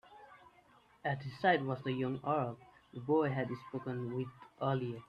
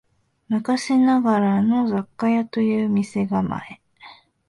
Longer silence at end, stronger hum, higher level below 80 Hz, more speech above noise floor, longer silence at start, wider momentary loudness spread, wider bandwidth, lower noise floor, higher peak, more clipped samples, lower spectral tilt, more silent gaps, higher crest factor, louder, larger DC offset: second, 0.05 s vs 0.35 s; neither; second, -72 dBFS vs -58 dBFS; about the same, 30 dB vs 27 dB; second, 0.1 s vs 0.5 s; first, 14 LU vs 9 LU; second, 6.6 kHz vs 11.5 kHz; first, -66 dBFS vs -47 dBFS; second, -16 dBFS vs -8 dBFS; neither; first, -8.5 dB/octave vs -7 dB/octave; neither; first, 20 dB vs 14 dB; second, -36 LUFS vs -21 LUFS; neither